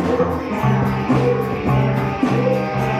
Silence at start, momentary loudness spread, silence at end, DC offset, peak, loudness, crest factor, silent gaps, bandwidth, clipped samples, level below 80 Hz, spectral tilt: 0 s; 3 LU; 0 s; under 0.1%; -4 dBFS; -18 LUFS; 14 dB; none; 13.5 kHz; under 0.1%; -38 dBFS; -8 dB/octave